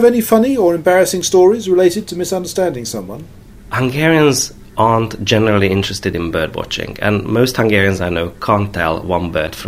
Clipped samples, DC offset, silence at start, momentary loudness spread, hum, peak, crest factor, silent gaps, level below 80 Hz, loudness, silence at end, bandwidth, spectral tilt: under 0.1%; under 0.1%; 0 s; 9 LU; none; 0 dBFS; 14 dB; none; -40 dBFS; -15 LUFS; 0 s; 16 kHz; -5 dB/octave